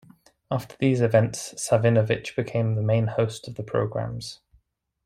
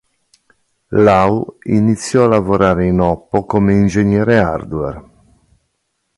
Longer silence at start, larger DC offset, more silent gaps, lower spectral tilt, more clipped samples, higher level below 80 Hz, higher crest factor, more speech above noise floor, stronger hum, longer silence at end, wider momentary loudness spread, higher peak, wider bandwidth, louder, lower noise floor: second, 0.5 s vs 0.9 s; neither; neither; about the same, -6 dB/octave vs -7 dB/octave; neither; second, -56 dBFS vs -36 dBFS; about the same, 18 dB vs 14 dB; second, 42 dB vs 56 dB; neither; second, 0.7 s vs 1.15 s; about the same, 11 LU vs 9 LU; second, -6 dBFS vs 0 dBFS; first, 13.5 kHz vs 11.5 kHz; second, -24 LUFS vs -14 LUFS; about the same, -66 dBFS vs -69 dBFS